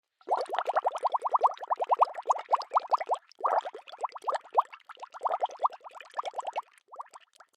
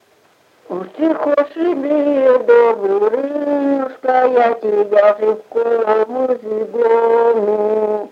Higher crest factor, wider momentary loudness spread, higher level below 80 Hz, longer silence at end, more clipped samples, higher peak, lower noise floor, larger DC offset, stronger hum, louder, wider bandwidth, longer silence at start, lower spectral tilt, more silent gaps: first, 22 dB vs 14 dB; first, 19 LU vs 7 LU; second, under -90 dBFS vs -74 dBFS; first, 0.4 s vs 0.05 s; neither; second, -10 dBFS vs 0 dBFS; about the same, -55 dBFS vs -53 dBFS; neither; neither; second, -31 LUFS vs -15 LUFS; first, 12 kHz vs 5.8 kHz; second, 0.25 s vs 0.7 s; second, -0.5 dB/octave vs -7 dB/octave; neither